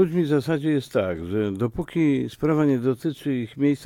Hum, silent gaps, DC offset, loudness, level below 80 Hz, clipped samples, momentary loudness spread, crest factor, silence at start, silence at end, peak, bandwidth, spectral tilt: none; none; under 0.1%; -24 LUFS; -52 dBFS; under 0.1%; 6 LU; 14 dB; 0 s; 0 s; -8 dBFS; 15 kHz; -8 dB/octave